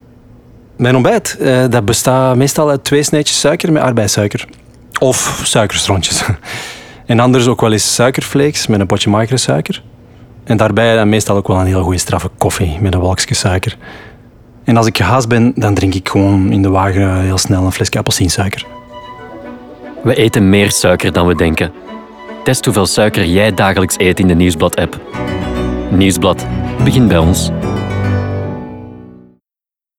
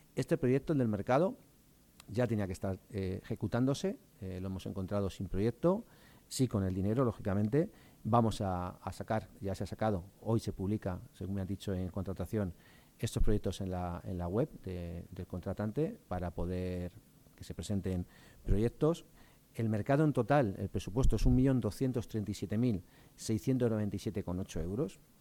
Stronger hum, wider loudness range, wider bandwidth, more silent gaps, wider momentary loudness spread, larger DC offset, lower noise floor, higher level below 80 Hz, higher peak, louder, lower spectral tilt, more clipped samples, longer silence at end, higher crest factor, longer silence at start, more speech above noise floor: neither; second, 3 LU vs 6 LU; about the same, 18 kHz vs 18 kHz; neither; first, 14 LU vs 11 LU; neither; first, -87 dBFS vs -64 dBFS; first, -34 dBFS vs -44 dBFS; first, 0 dBFS vs -16 dBFS; first, -12 LUFS vs -35 LUFS; second, -5 dB/octave vs -7.5 dB/octave; neither; first, 0.95 s vs 0.25 s; second, 12 dB vs 18 dB; first, 0.8 s vs 0.15 s; first, 76 dB vs 30 dB